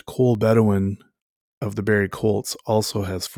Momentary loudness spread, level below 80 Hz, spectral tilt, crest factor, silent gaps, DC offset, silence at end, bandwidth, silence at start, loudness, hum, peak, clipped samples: 11 LU; -56 dBFS; -6 dB/octave; 16 dB; 1.22-1.61 s; under 0.1%; 0 s; 19 kHz; 0.1 s; -21 LUFS; none; -4 dBFS; under 0.1%